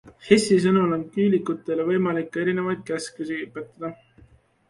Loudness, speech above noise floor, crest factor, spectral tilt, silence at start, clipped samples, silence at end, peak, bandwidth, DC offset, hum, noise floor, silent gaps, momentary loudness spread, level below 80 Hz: -23 LUFS; 33 dB; 22 dB; -6 dB/octave; 0.05 s; under 0.1%; 0.75 s; -2 dBFS; 11.5 kHz; under 0.1%; none; -55 dBFS; none; 16 LU; -62 dBFS